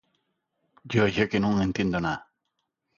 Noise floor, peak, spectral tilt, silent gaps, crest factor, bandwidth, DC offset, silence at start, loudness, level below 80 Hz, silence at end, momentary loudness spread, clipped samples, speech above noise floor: -80 dBFS; -8 dBFS; -6.5 dB/octave; none; 20 dB; 7.2 kHz; under 0.1%; 0.85 s; -26 LUFS; -52 dBFS; 0.8 s; 7 LU; under 0.1%; 55 dB